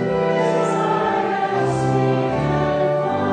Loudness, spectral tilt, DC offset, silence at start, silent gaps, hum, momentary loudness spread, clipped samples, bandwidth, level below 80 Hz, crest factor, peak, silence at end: -19 LUFS; -7 dB/octave; under 0.1%; 0 s; none; none; 2 LU; under 0.1%; 9.6 kHz; -46 dBFS; 12 dB; -6 dBFS; 0 s